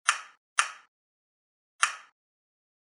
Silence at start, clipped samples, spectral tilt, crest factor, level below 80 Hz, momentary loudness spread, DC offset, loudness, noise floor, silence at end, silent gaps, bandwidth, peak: 0.05 s; under 0.1%; 6 dB/octave; 32 dB; -88 dBFS; 15 LU; under 0.1%; -30 LUFS; under -90 dBFS; 0.8 s; 0.37-0.56 s, 0.88-1.79 s; 16 kHz; -2 dBFS